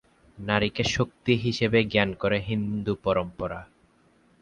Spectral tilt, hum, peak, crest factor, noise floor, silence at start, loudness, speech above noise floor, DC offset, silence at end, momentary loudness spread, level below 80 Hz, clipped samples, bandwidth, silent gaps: -5.5 dB/octave; none; -6 dBFS; 22 dB; -62 dBFS; 0.35 s; -26 LUFS; 36 dB; under 0.1%; 0.75 s; 11 LU; -50 dBFS; under 0.1%; 10 kHz; none